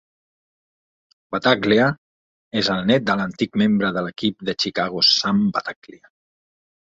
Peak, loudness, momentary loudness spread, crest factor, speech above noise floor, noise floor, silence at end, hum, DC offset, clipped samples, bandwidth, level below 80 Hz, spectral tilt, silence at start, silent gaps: -2 dBFS; -19 LUFS; 12 LU; 20 dB; over 70 dB; under -90 dBFS; 1.2 s; none; under 0.1%; under 0.1%; 7.8 kHz; -58 dBFS; -5 dB/octave; 1.3 s; 1.98-2.51 s